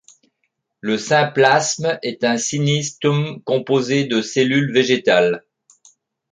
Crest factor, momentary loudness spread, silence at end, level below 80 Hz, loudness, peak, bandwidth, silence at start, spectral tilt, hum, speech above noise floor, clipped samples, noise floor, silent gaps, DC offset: 18 dB; 8 LU; 0.95 s; -64 dBFS; -18 LUFS; -2 dBFS; 9.6 kHz; 0.85 s; -4.5 dB/octave; none; 55 dB; under 0.1%; -72 dBFS; none; under 0.1%